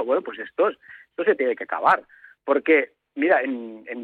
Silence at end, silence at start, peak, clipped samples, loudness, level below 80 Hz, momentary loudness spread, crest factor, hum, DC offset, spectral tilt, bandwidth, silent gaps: 0 s; 0 s; -6 dBFS; under 0.1%; -23 LUFS; -74 dBFS; 14 LU; 18 dB; none; under 0.1%; -6.5 dB/octave; 4.7 kHz; none